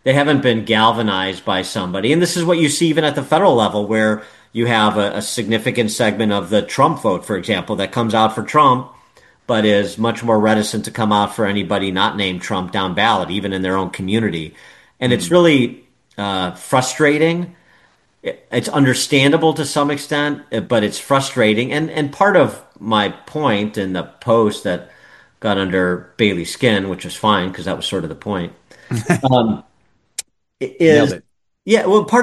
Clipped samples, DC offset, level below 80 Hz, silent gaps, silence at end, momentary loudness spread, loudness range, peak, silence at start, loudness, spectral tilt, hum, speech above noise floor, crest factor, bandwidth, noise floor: under 0.1%; under 0.1%; -54 dBFS; none; 0 s; 11 LU; 3 LU; 0 dBFS; 0.05 s; -17 LUFS; -5 dB/octave; none; 44 dB; 16 dB; 12.5 kHz; -61 dBFS